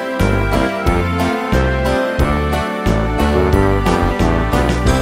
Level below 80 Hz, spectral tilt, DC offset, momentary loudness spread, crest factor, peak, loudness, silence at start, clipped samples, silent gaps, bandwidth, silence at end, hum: -20 dBFS; -6.5 dB/octave; under 0.1%; 3 LU; 14 dB; -2 dBFS; -16 LUFS; 0 s; under 0.1%; none; 16 kHz; 0 s; none